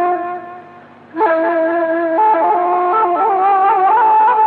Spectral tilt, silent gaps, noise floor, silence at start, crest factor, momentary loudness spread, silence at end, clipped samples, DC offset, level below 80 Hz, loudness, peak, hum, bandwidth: -7.5 dB/octave; none; -39 dBFS; 0 s; 10 dB; 11 LU; 0 s; under 0.1%; under 0.1%; -78 dBFS; -13 LUFS; -4 dBFS; none; 4.5 kHz